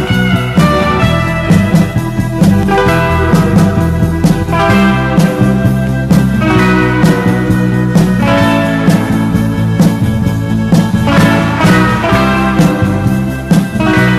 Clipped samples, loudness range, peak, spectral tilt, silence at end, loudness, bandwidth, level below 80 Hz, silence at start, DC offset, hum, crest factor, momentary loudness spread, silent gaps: under 0.1%; 1 LU; 0 dBFS; -7 dB/octave; 0 s; -10 LUFS; 14 kHz; -26 dBFS; 0 s; under 0.1%; none; 10 dB; 4 LU; none